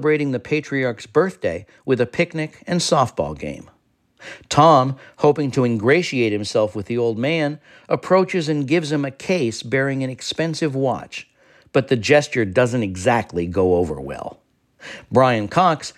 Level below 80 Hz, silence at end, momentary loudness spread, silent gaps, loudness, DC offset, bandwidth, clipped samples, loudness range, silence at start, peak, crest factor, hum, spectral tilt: -52 dBFS; 0.05 s; 12 LU; none; -19 LUFS; under 0.1%; 13.5 kHz; under 0.1%; 4 LU; 0 s; 0 dBFS; 20 dB; none; -5.5 dB/octave